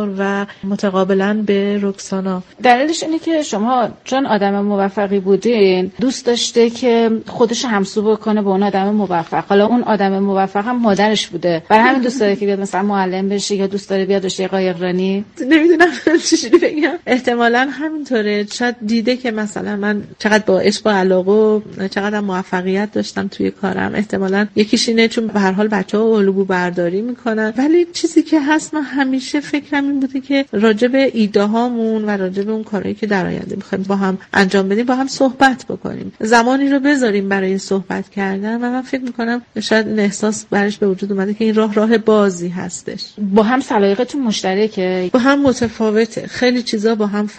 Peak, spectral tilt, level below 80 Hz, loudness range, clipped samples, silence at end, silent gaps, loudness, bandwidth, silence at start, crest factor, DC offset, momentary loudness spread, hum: 0 dBFS; -5 dB/octave; -54 dBFS; 3 LU; under 0.1%; 0 s; none; -16 LUFS; 9.2 kHz; 0 s; 16 dB; under 0.1%; 8 LU; none